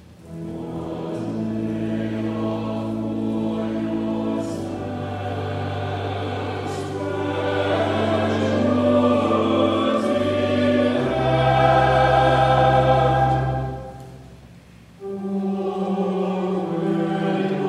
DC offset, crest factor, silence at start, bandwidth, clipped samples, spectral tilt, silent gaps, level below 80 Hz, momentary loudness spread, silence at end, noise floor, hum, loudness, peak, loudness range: under 0.1%; 18 dB; 0.1 s; 11.5 kHz; under 0.1%; -7.5 dB/octave; none; -42 dBFS; 12 LU; 0 s; -46 dBFS; none; -21 LUFS; -4 dBFS; 9 LU